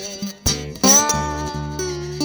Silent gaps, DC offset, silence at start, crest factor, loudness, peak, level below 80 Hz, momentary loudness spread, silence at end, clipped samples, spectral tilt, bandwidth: none; under 0.1%; 0 s; 18 dB; -18 LUFS; -2 dBFS; -36 dBFS; 14 LU; 0 s; under 0.1%; -2.5 dB/octave; over 20 kHz